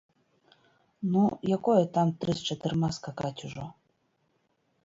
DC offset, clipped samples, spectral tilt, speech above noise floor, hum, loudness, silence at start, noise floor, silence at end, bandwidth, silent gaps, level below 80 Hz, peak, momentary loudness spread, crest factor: under 0.1%; under 0.1%; -7 dB/octave; 45 dB; none; -29 LUFS; 1 s; -73 dBFS; 1.15 s; 7.8 kHz; none; -62 dBFS; -12 dBFS; 15 LU; 18 dB